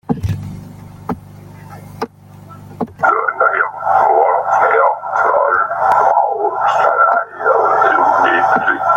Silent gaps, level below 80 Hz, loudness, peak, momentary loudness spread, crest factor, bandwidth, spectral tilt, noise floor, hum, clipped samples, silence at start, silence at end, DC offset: none; -46 dBFS; -13 LUFS; 0 dBFS; 16 LU; 14 dB; 16.5 kHz; -6.5 dB/octave; -37 dBFS; 50 Hz at -50 dBFS; under 0.1%; 0.1 s; 0 s; under 0.1%